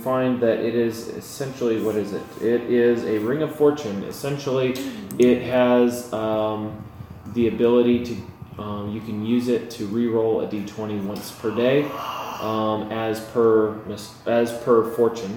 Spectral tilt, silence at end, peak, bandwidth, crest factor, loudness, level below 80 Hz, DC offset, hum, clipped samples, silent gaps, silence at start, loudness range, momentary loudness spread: -6.5 dB/octave; 0 s; -6 dBFS; 19 kHz; 16 dB; -22 LUFS; -56 dBFS; under 0.1%; none; under 0.1%; none; 0 s; 3 LU; 13 LU